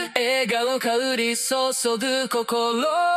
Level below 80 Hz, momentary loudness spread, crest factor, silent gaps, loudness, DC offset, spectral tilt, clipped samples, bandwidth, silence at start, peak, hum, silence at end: -76 dBFS; 2 LU; 18 dB; none; -22 LUFS; under 0.1%; -1.5 dB/octave; under 0.1%; 16 kHz; 0 s; -4 dBFS; none; 0 s